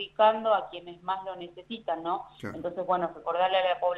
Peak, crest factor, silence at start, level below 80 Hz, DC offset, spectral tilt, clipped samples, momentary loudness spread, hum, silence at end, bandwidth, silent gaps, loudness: -10 dBFS; 18 dB; 0 s; -68 dBFS; under 0.1%; -6 dB/octave; under 0.1%; 16 LU; 50 Hz at -65 dBFS; 0 s; 7.6 kHz; none; -29 LUFS